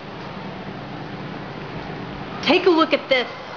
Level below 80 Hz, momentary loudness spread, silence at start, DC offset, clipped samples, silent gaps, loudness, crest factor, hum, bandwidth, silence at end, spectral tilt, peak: -52 dBFS; 16 LU; 0 s; 0.2%; under 0.1%; none; -21 LUFS; 18 dB; none; 5.4 kHz; 0 s; -6 dB/octave; -4 dBFS